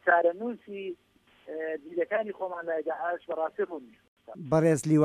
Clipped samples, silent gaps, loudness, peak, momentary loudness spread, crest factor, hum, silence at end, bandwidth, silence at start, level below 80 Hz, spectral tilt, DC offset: under 0.1%; 4.08-4.17 s; -30 LUFS; -10 dBFS; 17 LU; 18 dB; none; 0 s; 13.5 kHz; 0.05 s; -68 dBFS; -7 dB/octave; under 0.1%